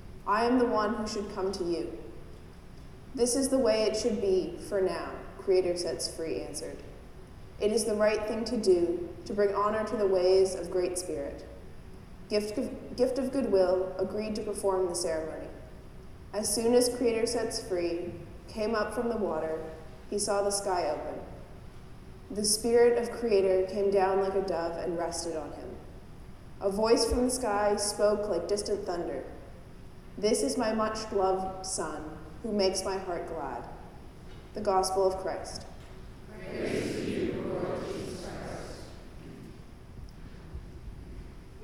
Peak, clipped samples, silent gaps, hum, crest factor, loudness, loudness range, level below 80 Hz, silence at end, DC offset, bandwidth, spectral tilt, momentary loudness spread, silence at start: -12 dBFS; under 0.1%; none; none; 18 dB; -30 LUFS; 6 LU; -50 dBFS; 0 s; under 0.1%; 15 kHz; -4 dB/octave; 23 LU; 0 s